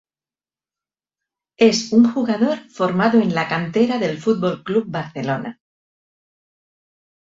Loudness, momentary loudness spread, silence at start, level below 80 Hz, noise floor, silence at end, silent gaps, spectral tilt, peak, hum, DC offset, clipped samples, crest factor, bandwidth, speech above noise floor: -19 LUFS; 9 LU; 1.6 s; -62 dBFS; under -90 dBFS; 1.75 s; none; -5.5 dB/octave; -2 dBFS; none; under 0.1%; under 0.1%; 18 dB; 7.6 kHz; over 72 dB